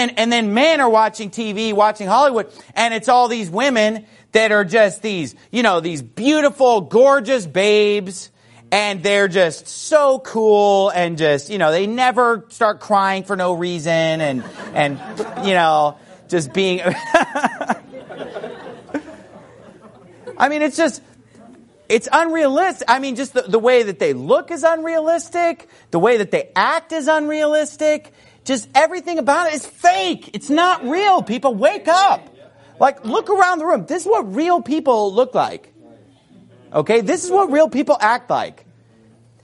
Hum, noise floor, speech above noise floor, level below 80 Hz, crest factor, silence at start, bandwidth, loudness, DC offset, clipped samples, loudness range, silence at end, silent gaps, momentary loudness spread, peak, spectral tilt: none; -50 dBFS; 34 dB; -64 dBFS; 18 dB; 0 s; 11.5 kHz; -17 LUFS; under 0.1%; under 0.1%; 4 LU; 0.95 s; none; 10 LU; 0 dBFS; -4 dB/octave